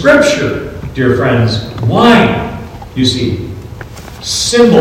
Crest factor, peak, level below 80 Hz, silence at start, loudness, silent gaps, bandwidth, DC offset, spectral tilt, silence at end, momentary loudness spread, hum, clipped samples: 12 dB; 0 dBFS; -34 dBFS; 0 s; -11 LUFS; none; 16 kHz; under 0.1%; -5 dB/octave; 0 s; 19 LU; none; 2%